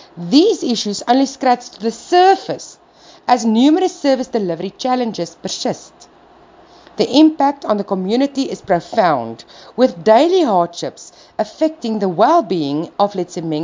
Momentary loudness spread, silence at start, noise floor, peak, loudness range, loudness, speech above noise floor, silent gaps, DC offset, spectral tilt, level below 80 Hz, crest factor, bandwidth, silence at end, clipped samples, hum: 13 LU; 0.15 s; -45 dBFS; 0 dBFS; 3 LU; -16 LUFS; 30 dB; none; under 0.1%; -5 dB/octave; -60 dBFS; 16 dB; 7.6 kHz; 0 s; under 0.1%; none